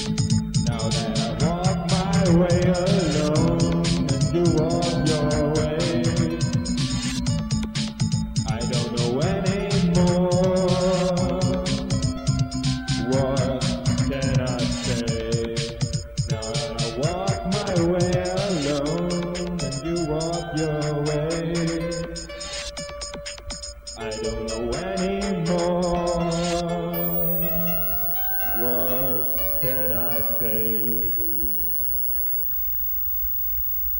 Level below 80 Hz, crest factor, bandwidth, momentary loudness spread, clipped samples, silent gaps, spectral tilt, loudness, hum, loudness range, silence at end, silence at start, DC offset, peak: -38 dBFS; 14 dB; 17 kHz; 8 LU; under 0.1%; none; -5.5 dB/octave; -22 LUFS; none; 7 LU; 0 s; 0 s; 0.2%; -8 dBFS